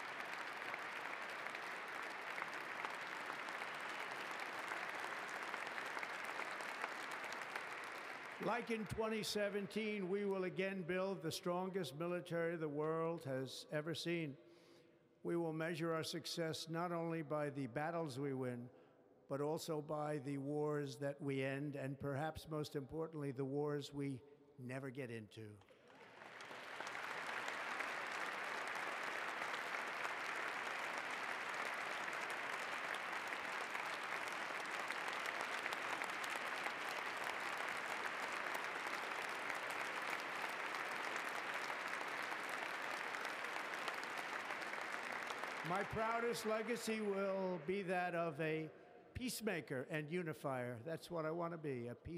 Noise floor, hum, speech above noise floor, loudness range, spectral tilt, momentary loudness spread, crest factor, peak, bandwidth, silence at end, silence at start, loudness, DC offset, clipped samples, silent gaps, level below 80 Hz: -69 dBFS; none; 26 dB; 4 LU; -4.5 dB/octave; 5 LU; 22 dB; -24 dBFS; 15.5 kHz; 0 s; 0 s; -44 LUFS; under 0.1%; under 0.1%; none; -76 dBFS